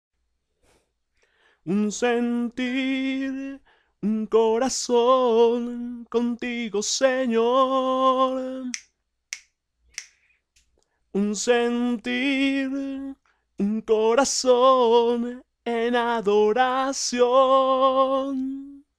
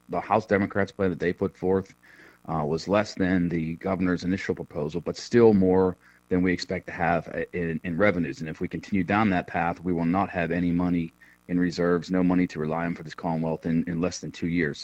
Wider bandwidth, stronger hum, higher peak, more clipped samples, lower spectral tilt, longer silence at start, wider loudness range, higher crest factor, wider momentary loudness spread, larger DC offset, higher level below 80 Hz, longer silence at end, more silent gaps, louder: first, 11.5 kHz vs 8.4 kHz; neither; about the same, -8 dBFS vs -6 dBFS; neither; second, -3.5 dB/octave vs -7 dB/octave; first, 1.65 s vs 0.1 s; first, 7 LU vs 3 LU; about the same, 16 dB vs 20 dB; first, 15 LU vs 9 LU; neither; second, -62 dBFS vs -54 dBFS; first, 0.2 s vs 0 s; neither; first, -22 LUFS vs -26 LUFS